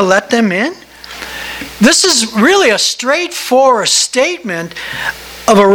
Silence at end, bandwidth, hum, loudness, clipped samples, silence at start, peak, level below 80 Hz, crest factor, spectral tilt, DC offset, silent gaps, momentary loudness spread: 0 s; over 20 kHz; none; -11 LUFS; 0.3%; 0 s; 0 dBFS; -46 dBFS; 12 dB; -2.5 dB/octave; under 0.1%; none; 14 LU